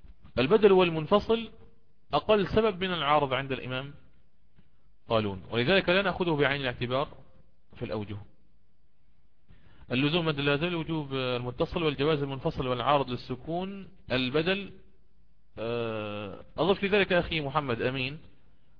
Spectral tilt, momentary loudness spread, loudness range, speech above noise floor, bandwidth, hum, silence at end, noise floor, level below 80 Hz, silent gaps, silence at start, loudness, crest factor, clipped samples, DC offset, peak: -8 dB/octave; 12 LU; 5 LU; 42 dB; 5.4 kHz; none; 0.6 s; -70 dBFS; -52 dBFS; none; 0.1 s; -28 LUFS; 22 dB; under 0.1%; 0.4%; -8 dBFS